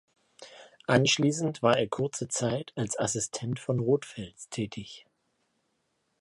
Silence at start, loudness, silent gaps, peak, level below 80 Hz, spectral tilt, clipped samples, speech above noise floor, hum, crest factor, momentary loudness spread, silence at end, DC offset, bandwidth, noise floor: 0.4 s; -28 LUFS; none; -6 dBFS; -64 dBFS; -4.5 dB/octave; under 0.1%; 48 dB; none; 24 dB; 17 LU; 1.2 s; under 0.1%; 11.5 kHz; -76 dBFS